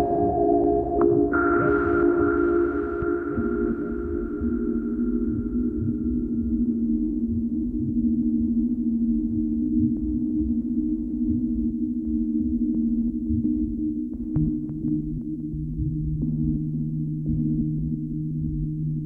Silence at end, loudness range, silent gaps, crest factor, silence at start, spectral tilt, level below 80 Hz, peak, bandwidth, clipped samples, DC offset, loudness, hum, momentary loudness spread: 0 s; 5 LU; none; 16 dB; 0 s; -12.5 dB/octave; -36 dBFS; -8 dBFS; 2.5 kHz; under 0.1%; under 0.1%; -25 LUFS; none; 7 LU